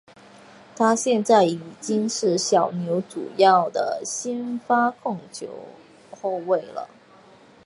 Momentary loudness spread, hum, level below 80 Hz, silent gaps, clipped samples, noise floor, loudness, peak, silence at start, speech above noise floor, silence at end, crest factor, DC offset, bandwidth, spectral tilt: 18 LU; none; -74 dBFS; none; under 0.1%; -51 dBFS; -22 LUFS; -4 dBFS; 0.75 s; 29 dB; 0.8 s; 20 dB; under 0.1%; 11.5 kHz; -4 dB/octave